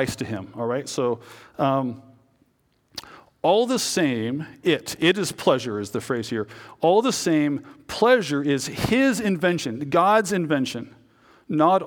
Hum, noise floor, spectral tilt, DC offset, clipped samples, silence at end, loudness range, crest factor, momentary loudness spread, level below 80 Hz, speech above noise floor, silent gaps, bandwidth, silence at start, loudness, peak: none; -66 dBFS; -4.5 dB/octave; under 0.1%; under 0.1%; 0 s; 4 LU; 20 dB; 14 LU; -56 dBFS; 43 dB; none; 19.5 kHz; 0 s; -23 LUFS; -4 dBFS